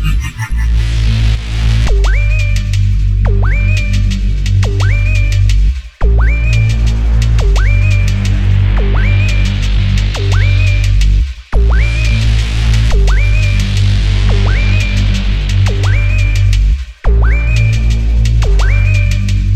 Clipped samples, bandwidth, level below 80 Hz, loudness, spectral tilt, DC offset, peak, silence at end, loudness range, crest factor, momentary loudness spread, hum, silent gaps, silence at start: under 0.1%; 8.8 kHz; -12 dBFS; -13 LUFS; -5.5 dB/octave; under 0.1%; 0 dBFS; 0 s; 1 LU; 8 dB; 3 LU; none; none; 0 s